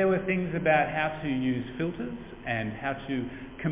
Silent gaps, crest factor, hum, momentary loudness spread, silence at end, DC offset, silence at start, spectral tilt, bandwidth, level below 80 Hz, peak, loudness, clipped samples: none; 18 dB; none; 12 LU; 0 s; under 0.1%; 0 s; -5.5 dB/octave; 3.9 kHz; -52 dBFS; -10 dBFS; -29 LUFS; under 0.1%